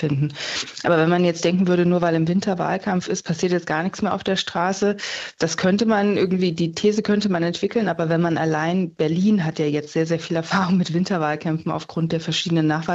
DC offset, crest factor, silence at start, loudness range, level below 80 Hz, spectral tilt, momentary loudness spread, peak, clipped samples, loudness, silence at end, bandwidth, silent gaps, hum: under 0.1%; 16 dB; 0 s; 2 LU; -60 dBFS; -5.5 dB/octave; 6 LU; -4 dBFS; under 0.1%; -21 LUFS; 0 s; 8 kHz; none; none